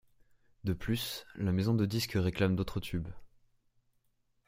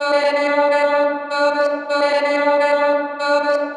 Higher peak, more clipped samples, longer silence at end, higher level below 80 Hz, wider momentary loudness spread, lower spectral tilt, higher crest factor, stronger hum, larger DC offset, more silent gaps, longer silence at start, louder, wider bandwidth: second, -14 dBFS vs -4 dBFS; neither; first, 1.2 s vs 0 s; first, -54 dBFS vs under -90 dBFS; first, 9 LU vs 3 LU; first, -6 dB/octave vs -2 dB/octave; first, 20 dB vs 12 dB; neither; neither; neither; first, 0.65 s vs 0 s; second, -33 LUFS vs -17 LUFS; first, 16 kHz vs 10 kHz